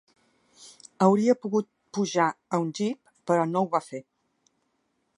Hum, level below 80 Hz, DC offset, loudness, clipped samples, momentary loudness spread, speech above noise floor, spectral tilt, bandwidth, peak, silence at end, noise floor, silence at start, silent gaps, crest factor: none; -78 dBFS; under 0.1%; -26 LUFS; under 0.1%; 18 LU; 49 dB; -6 dB/octave; 11 kHz; -6 dBFS; 1.15 s; -74 dBFS; 0.6 s; none; 20 dB